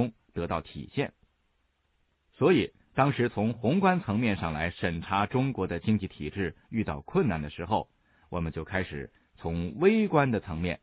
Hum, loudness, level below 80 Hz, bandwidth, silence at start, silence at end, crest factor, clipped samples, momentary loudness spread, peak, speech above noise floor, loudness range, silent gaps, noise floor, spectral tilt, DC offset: none; -29 LUFS; -54 dBFS; 5 kHz; 0 s; 0.05 s; 20 dB; under 0.1%; 12 LU; -10 dBFS; 45 dB; 5 LU; none; -73 dBFS; -6 dB/octave; under 0.1%